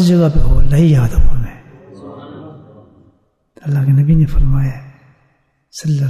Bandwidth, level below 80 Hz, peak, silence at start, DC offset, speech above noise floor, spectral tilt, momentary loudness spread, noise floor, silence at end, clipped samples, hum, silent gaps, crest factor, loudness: 12 kHz; -18 dBFS; -2 dBFS; 0 s; under 0.1%; 49 dB; -8 dB/octave; 22 LU; -59 dBFS; 0 s; under 0.1%; none; none; 12 dB; -14 LUFS